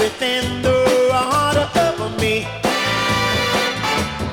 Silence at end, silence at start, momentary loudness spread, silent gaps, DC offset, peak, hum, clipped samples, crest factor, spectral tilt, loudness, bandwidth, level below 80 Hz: 0 s; 0 s; 5 LU; none; under 0.1%; -2 dBFS; none; under 0.1%; 16 dB; -4 dB/octave; -17 LUFS; 18.5 kHz; -40 dBFS